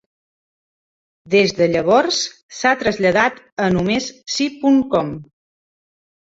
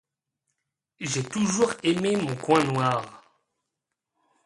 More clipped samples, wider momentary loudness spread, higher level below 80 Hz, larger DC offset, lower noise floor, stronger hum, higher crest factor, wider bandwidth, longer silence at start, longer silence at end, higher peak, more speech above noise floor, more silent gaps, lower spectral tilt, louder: neither; about the same, 7 LU vs 8 LU; first, -52 dBFS vs -64 dBFS; neither; first, under -90 dBFS vs -84 dBFS; neither; about the same, 18 dB vs 22 dB; second, 8 kHz vs 11.5 kHz; first, 1.25 s vs 1 s; about the same, 1.15 s vs 1.25 s; about the same, -2 dBFS vs -4 dBFS; first, over 73 dB vs 60 dB; first, 2.43-2.49 s, 3.52-3.57 s vs none; about the same, -4.5 dB/octave vs -4.5 dB/octave; first, -17 LUFS vs -25 LUFS